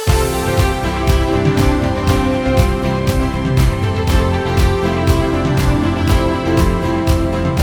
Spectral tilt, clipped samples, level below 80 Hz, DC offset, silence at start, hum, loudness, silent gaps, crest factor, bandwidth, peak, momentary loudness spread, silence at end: -6.5 dB/octave; under 0.1%; -20 dBFS; under 0.1%; 0 s; none; -15 LUFS; none; 14 dB; 19 kHz; 0 dBFS; 2 LU; 0 s